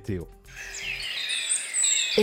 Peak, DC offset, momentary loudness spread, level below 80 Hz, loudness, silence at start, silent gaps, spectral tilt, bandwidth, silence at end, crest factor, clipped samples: -10 dBFS; under 0.1%; 17 LU; -52 dBFS; -25 LUFS; 0 s; none; -1 dB/octave; 17 kHz; 0 s; 18 dB; under 0.1%